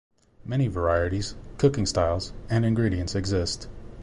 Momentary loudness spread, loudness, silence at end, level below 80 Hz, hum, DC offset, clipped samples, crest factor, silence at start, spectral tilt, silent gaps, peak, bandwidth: 10 LU; -26 LUFS; 0 s; -38 dBFS; none; under 0.1%; under 0.1%; 18 dB; 0.4 s; -6 dB/octave; none; -8 dBFS; 11.5 kHz